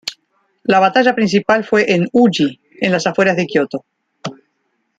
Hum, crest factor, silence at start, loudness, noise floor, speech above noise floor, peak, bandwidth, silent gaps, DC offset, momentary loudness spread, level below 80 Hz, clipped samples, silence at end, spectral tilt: none; 16 dB; 0.05 s; -15 LUFS; -67 dBFS; 54 dB; 0 dBFS; 9.4 kHz; none; under 0.1%; 17 LU; -60 dBFS; under 0.1%; 0.65 s; -5.5 dB/octave